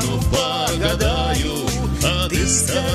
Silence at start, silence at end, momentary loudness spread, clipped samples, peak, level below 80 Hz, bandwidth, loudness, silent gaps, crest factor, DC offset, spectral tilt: 0 s; 0 s; 5 LU; under 0.1%; -4 dBFS; -26 dBFS; 16 kHz; -19 LUFS; none; 14 dB; under 0.1%; -3.5 dB/octave